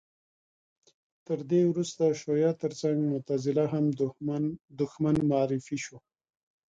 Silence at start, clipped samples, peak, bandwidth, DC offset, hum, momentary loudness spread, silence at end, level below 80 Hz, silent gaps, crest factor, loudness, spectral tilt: 1.3 s; under 0.1%; -14 dBFS; 9.2 kHz; under 0.1%; none; 9 LU; 0.7 s; -64 dBFS; 4.64-4.68 s; 16 dB; -29 LUFS; -7 dB/octave